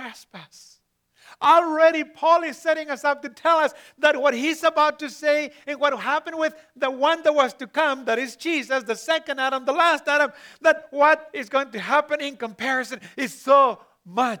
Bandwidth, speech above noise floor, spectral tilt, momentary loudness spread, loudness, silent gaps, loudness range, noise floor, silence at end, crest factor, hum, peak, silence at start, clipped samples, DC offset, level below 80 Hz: 19.5 kHz; 38 dB; -2.5 dB/octave; 10 LU; -22 LUFS; none; 2 LU; -60 dBFS; 0 s; 20 dB; none; -4 dBFS; 0 s; under 0.1%; under 0.1%; -78 dBFS